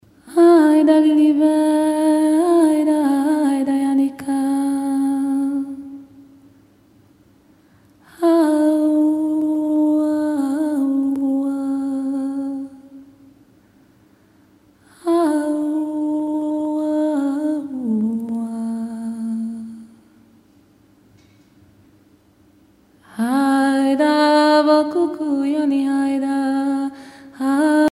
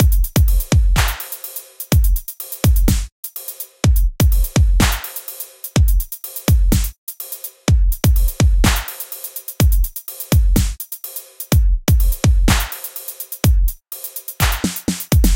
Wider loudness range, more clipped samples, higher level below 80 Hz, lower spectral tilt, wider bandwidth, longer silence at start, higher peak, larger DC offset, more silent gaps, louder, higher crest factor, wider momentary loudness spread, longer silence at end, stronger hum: first, 11 LU vs 2 LU; neither; second, -66 dBFS vs -18 dBFS; about the same, -5 dB/octave vs -5 dB/octave; second, 14 kHz vs 17.5 kHz; first, 0.25 s vs 0 s; second, -4 dBFS vs 0 dBFS; neither; second, none vs 3.12-3.23 s, 6.98-7.07 s; about the same, -18 LUFS vs -18 LUFS; about the same, 16 dB vs 16 dB; about the same, 12 LU vs 12 LU; about the same, 0 s vs 0 s; neither